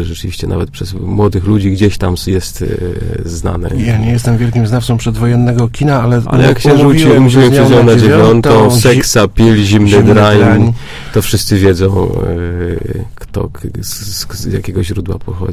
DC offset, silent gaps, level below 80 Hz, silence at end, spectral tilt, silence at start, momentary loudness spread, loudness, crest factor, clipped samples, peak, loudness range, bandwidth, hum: under 0.1%; none; -24 dBFS; 0 s; -6 dB/octave; 0 s; 14 LU; -10 LUFS; 10 dB; 0.7%; 0 dBFS; 8 LU; 16 kHz; none